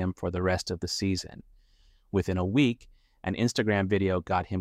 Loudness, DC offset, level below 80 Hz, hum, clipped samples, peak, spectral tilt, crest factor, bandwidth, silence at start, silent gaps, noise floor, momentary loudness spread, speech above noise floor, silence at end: -28 LUFS; under 0.1%; -52 dBFS; none; under 0.1%; -10 dBFS; -5.5 dB/octave; 18 dB; 14.5 kHz; 0 s; none; -61 dBFS; 9 LU; 33 dB; 0 s